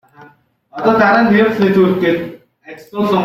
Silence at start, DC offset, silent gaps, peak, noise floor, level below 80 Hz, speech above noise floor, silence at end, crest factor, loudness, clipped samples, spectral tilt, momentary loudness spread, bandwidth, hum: 0.2 s; under 0.1%; none; 0 dBFS; -47 dBFS; -52 dBFS; 35 dB; 0 s; 14 dB; -13 LUFS; under 0.1%; -7.5 dB/octave; 16 LU; 15 kHz; none